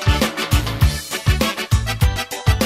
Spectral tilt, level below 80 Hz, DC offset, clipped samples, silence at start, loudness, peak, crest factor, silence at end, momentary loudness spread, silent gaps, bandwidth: -4.5 dB/octave; -22 dBFS; under 0.1%; under 0.1%; 0 s; -19 LUFS; -4 dBFS; 14 dB; 0 s; 2 LU; none; 16.5 kHz